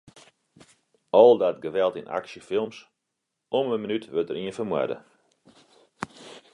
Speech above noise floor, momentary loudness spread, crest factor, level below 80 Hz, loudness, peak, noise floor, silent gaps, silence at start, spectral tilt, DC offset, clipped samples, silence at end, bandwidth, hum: 58 dB; 21 LU; 24 dB; -70 dBFS; -24 LUFS; -2 dBFS; -82 dBFS; none; 1.15 s; -6 dB/octave; under 0.1%; under 0.1%; 0.15 s; 11 kHz; none